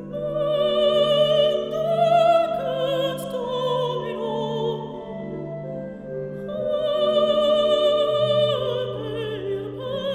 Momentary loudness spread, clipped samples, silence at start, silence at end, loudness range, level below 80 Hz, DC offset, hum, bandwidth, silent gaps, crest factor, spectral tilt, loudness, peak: 14 LU; under 0.1%; 0 s; 0 s; 7 LU; -54 dBFS; under 0.1%; none; 13.5 kHz; none; 14 dB; -6 dB/octave; -22 LUFS; -8 dBFS